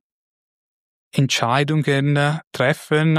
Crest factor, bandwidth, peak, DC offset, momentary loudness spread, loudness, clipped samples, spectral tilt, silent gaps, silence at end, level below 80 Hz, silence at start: 18 dB; 14.5 kHz; -2 dBFS; under 0.1%; 4 LU; -19 LUFS; under 0.1%; -5.5 dB/octave; 2.47-2.51 s; 0 s; -62 dBFS; 1.15 s